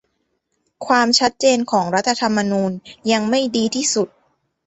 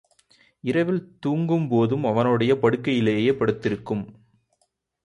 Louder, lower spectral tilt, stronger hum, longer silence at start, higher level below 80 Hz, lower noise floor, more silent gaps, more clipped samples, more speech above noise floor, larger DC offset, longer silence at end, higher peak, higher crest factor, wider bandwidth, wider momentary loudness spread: first, -18 LUFS vs -23 LUFS; second, -3 dB/octave vs -8 dB/octave; neither; first, 0.8 s vs 0.65 s; about the same, -60 dBFS vs -58 dBFS; about the same, -70 dBFS vs -72 dBFS; neither; neither; about the same, 52 dB vs 50 dB; neither; second, 0.6 s vs 0.95 s; first, -2 dBFS vs -6 dBFS; about the same, 18 dB vs 18 dB; second, 8.2 kHz vs 11 kHz; about the same, 9 LU vs 9 LU